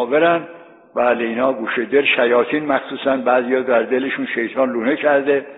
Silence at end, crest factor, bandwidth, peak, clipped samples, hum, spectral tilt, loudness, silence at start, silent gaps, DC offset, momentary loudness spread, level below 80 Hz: 0 s; 16 dB; 4.1 kHz; -2 dBFS; under 0.1%; none; -8.5 dB/octave; -17 LUFS; 0 s; none; under 0.1%; 6 LU; -66 dBFS